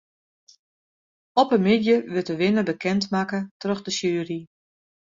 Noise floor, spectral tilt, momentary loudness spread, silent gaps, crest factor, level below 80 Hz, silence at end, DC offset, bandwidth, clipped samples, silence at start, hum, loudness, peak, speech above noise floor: under -90 dBFS; -5.5 dB/octave; 9 LU; 3.51-3.60 s; 20 dB; -64 dBFS; 0.6 s; under 0.1%; 7.6 kHz; under 0.1%; 1.35 s; none; -23 LUFS; -4 dBFS; over 68 dB